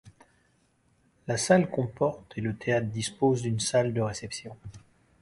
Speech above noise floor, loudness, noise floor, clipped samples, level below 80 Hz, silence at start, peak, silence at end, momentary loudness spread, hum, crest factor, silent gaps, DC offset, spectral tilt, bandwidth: 40 dB; -28 LUFS; -68 dBFS; under 0.1%; -58 dBFS; 0.05 s; -8 dBFS; 0.45 s; 17 LU; none; 22 dB; none; under 0.1%; -5 dB/octave; 11.5 kHz